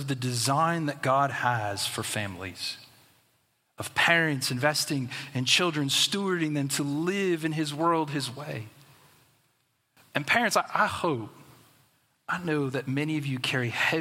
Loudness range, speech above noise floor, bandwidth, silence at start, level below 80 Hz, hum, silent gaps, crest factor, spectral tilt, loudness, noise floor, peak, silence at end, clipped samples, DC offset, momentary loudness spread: 5 LU; 44 dB; 16.5 kHz; 0 s; -70 dBFS; none; none; 24 dB; -3.5 dB/octave; -27 LUFS; -72 dBFS; -6 dBFS; 0 s; under 0.1%; under 0.1%; 11 LU